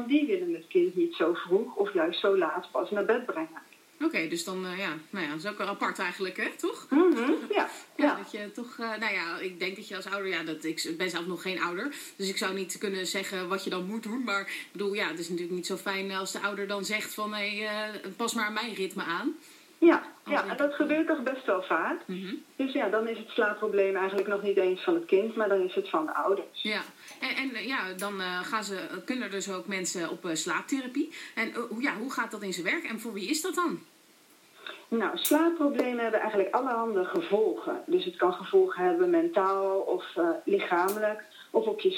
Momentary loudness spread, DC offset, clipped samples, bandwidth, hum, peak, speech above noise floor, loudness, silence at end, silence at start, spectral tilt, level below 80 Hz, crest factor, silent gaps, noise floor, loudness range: 8 LU; under 0.1%; under 0.1%; 16 kHz; none; -10 dBFS; 30 dB; -30 LUFS; 0 s; 0 s; -4 dB/octave; under -90 dBFS; 20 dB; none; -59 dBFS; 5 LU